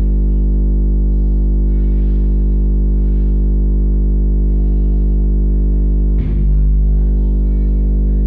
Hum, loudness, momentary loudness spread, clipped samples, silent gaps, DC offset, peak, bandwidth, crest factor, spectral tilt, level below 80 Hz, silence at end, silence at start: 50 Hz at -15 dBFS; -16 LUFS; 1 LU; under 0.1%; none; 0.2%; -8 dBFS; 1 kHz; 4 dB; -13 dB/octave; -12 dBFS; 0 s; 0 s